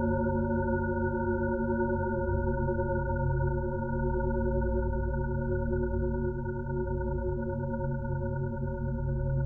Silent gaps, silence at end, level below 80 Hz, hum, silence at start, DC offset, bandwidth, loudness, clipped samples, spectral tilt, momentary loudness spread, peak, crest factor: none; 0 s; -36 dBFS; none; 0 s; under 0.1%; 1.6 kHz; -31 LUFS; under 0.1%; -12 dB/octave; 4 LU; -18 dBFS; 12 dB